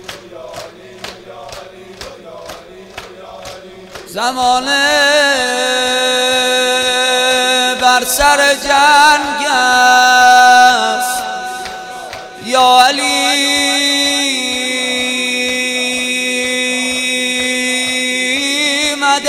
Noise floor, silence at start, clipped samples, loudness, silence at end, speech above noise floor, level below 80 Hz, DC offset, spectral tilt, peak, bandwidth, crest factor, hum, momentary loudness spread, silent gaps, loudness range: -33 dBFS; 0 s; 0.3%; -11 LUFS; 0 s; 20 dB; -44 dBFS; under 0.1%; 0 dB/octave; 0 dBFS; over 20 kHz; 14 dB; none; 23 LU; none; 12 LU